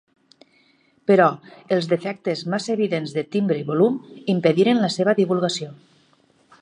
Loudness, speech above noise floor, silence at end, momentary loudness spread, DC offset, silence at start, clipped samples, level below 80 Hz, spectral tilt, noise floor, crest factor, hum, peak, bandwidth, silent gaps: -21 LUFS; 39 dB; 0.85 s; 10 LU; under 0.1%; 1.1 s; under 0.1%; -72 dBFS; -6 dB/octave; -60 dBFS; 18 dB; none; -4 dBFS; 10.5 kHz; none